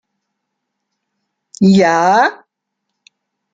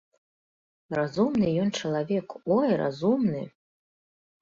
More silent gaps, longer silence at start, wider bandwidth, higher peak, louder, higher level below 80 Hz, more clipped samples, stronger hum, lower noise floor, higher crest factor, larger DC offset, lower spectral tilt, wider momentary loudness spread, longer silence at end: neither; first, 1.6 s vs 0.9 s; about the same, 7.8 kHz vs 7.6 kHz; first, -2 dBFS vs -12 dBFS; first, -12 LUFS vs -27 LUFS; about the same, -60 dBFS vs -64 dBFS; neither; neither; second, -76 dBFS vs under -90 dBFS; about the same, 16 dB vs 16 dB; neither; about the same, -6 dB/octave vs -6.5 dB/octave; about the same, 5 LU vs 7 LU; first, 1.2 s vs 0.95 s